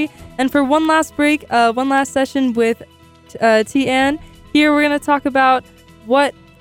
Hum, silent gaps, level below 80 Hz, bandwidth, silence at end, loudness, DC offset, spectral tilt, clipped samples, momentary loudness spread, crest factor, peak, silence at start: none; none; -48 dBFS; 16.5 kHz; 0.3 s; -16 LUFS; under 0.1%; -4 dB/octave; under 0.1%; 5 LU; 14 dB; -4 dBFS; 0 s